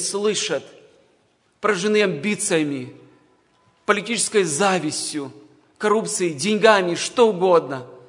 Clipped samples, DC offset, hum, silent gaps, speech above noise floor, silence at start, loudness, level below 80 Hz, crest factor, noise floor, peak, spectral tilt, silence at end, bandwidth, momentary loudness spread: under 0.1%; under 0.1%; none; none; 42 dB; 0 s; -20 LUFS; -72 dBFS; 22 dB; -62 dBFS; 0 dBFS; -3.5 dB/octave; 0.1 s; 11 kHz; 13 LU